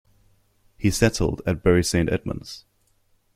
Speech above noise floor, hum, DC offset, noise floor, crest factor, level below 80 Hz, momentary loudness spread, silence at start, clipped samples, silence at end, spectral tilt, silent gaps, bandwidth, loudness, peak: 42 dB; none; under 0.1%; -64 dBFS; 22 dB; -40 dBFS; 14 LU; 0.8 s; under 0.1%; 0.75 s; -5.5 dB/octave; none; 16 kHz; -23 LUFS; -2 dBFS